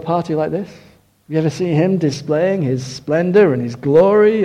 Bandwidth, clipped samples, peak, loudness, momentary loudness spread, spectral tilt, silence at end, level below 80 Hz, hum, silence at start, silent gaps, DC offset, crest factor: 10 kHz; under 0.1%; -2 dBFS; -16 LUFS; 10 LU; -7.5 dB/octave; 0 s; -54 dBFS; none; 0 s; none; under 0.1%; 14 dB